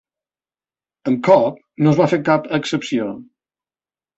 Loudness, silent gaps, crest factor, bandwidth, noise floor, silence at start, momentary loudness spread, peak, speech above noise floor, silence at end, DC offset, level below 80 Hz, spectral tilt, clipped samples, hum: -17 LUFS; none; 18 dB; 8.2 kHz; under -90 dBFS; 1.05 s; 12 LU; -2 dBFS; over 74 dB; 0.95 s; under 0.1%; -60 dBFS; -7 dB/octave; under 0.1%; none